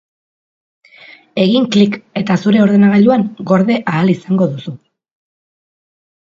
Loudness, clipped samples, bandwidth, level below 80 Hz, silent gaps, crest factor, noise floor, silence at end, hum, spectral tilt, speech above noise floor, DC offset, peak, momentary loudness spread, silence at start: -13 LUFS; under 0.1%; 7.4 kHz; -58 dBFS; none; 14 dB; -41 dBFS; 1.65 s; none; -7.5 dB/octave; 29 dB; under 0.1%; 0 dBFS; 10 LU; 1.35 s